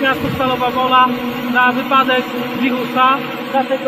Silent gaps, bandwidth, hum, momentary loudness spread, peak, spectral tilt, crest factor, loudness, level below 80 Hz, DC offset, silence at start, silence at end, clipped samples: none; 15 kHz; none; 6 LU; 0 dBFS; -5 dB/octave; 16 dB; -15 LUFS; -50 dBFS; under 0.1%; 0 s; 0 s; under 0.1%